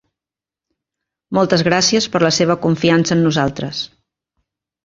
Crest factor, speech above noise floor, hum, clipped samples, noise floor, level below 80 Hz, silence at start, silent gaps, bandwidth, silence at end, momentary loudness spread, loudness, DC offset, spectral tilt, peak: 16 dB; 73 dB; none; under 0.1%; -89 dBFS; -52 dBFS; 1.3 s; none; 7.8 kHz; 1 s; 10 LU; -15 LUFS; under 0.1%; -4.5 dB/octave; 0 dBFS